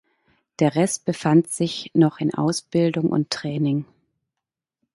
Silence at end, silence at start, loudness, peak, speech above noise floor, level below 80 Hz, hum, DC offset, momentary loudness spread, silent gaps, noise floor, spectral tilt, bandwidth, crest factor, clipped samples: 1.1 s; 0.6 s; -22 LUFS; -4 dBFS; 65 dB; -64 dBFS; none; under 0.1%; 6 LU; none; -86 dBFS; -6 dB/octave; 11.5 kHz; 18 dB; under 0.1%